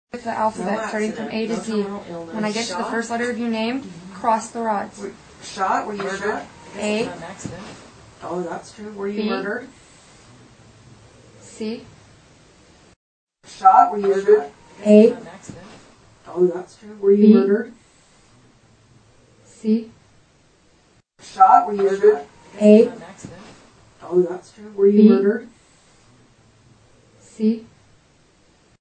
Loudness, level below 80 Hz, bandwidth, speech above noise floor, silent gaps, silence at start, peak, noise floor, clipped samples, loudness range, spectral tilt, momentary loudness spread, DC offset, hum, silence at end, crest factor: -19 LUFS; -60 dBFS; 9 kHz; 39 dB; 12.96-13.27 s; 0.15 s; 0 dBFS; -57 dBFS; under 0.1%; 13 LU; -6 dB/octave; 23 LU; under 0.1%; none; 1.15 s; 20 dB